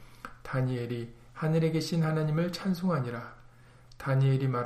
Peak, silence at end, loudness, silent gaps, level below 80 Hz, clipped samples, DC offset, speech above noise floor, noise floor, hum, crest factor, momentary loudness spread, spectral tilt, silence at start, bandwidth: -18 dBFS; 0 s; -30 LUFS; none; -58 dBFS; under 0.1%; under 0.1%; 26 dB; -54 dBFS; none; 12 dB; 15 LU; -7.5 dB/octave; 0 s; 14 kHz